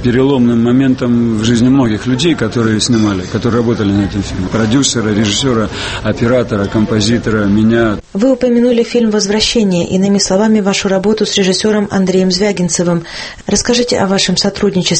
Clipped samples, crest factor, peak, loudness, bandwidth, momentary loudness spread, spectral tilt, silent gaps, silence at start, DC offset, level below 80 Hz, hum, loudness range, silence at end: under 0.1%; 12 dB; 0 dBFS; -12 LUFS; 8.8 kHz; 5 LU; -5 dB/octave; none; 0 s; under 0.1%; -34 dBFS; none; 2 LU; 0 s